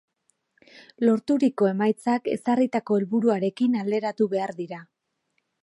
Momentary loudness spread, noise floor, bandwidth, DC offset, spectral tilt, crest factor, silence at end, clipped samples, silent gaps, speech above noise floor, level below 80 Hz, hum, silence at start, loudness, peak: 7 LU; -75 dBFS; 11.5 kHz; under 0.1%; -7.5 dB/octave; 16 dB; 0.8 s; under 0.1%; none; 52 dB; -76 dBFS; none; 1 s; -24 LUFS; -8 dBFS